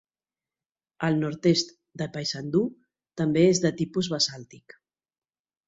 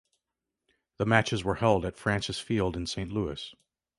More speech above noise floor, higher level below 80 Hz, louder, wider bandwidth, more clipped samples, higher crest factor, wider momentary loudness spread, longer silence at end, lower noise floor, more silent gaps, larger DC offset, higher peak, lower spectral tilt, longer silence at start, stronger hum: first, over 65 dB vs 59 dB; second, -64 dBFS vs -50 dBFS; first, -26 LUFS vs -29 LUFS; second, 8 kHz vs 11.5 kHz; neither; about the same, 20 dB vs 24 dB; first, 14 LU vs 9 LU; first, 1.1 s vs 0.45 s; about the same, under -90 dBFS vs -87 dBFS; neither; neither; about the same, -8 dBFS vs -6 dBFS; about the same, -5 dB/octave vs -5.5 dB/octave; about the same, 1 s vs 1 s; neither